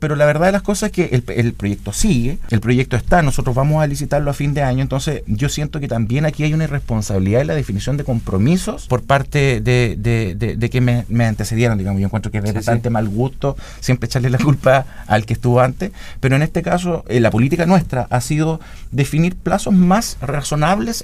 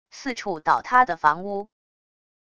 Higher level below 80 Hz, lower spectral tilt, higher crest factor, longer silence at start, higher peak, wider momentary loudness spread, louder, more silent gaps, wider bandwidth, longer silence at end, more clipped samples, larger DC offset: first, -30 dBFS vs -62 dBFS; first, -6.5 dB/octave vs -4 dB/octave; second, 16 dB vs 22 dB; second, 0 s vs 0.15 s; first, 0 dBFS vs -4 dBFS; second, 6 LU vs 13 LU; first, -17 LUFS vs -22 LUFS; neither; first, 15.5 kHz vs 10 kHz; second, 0 s vs 0.75 s; neither; neither